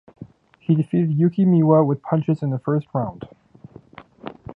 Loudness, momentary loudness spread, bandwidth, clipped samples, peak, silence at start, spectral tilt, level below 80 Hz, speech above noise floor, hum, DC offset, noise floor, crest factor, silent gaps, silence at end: -20 LUFS; 22 LU; 3.9 kHz; under 0.1%; -2 dBFS; 0.2 s; -12 dB/octave; -58 dBFS; 27 dB; none; under 0.1%; -45 dBFS; 18 dB; none; 0.05 s